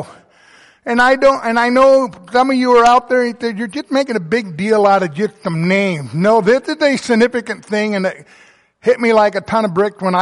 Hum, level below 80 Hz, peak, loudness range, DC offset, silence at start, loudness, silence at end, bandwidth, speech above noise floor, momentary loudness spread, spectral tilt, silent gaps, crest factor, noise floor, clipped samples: none; -52 dBFS; -2 dBFS; 3 LU; under 0.1%; 0 s; -14 LUFS; 0 s; 11.5 kHz; 33 dB; 10 LU; -5.5 dB/octave; none; 12 dB; -47 dBFS; under 0.1%